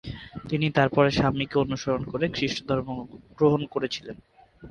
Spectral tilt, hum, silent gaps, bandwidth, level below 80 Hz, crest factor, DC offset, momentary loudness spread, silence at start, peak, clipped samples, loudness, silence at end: -6 dB/octave; none; none; 9.8 kHz; -50 dBFS; 20 dB; under 0.1%; 17 LU; 0.05 s; -6 dBFS; under 0.1%; -25 LUFS; 0 s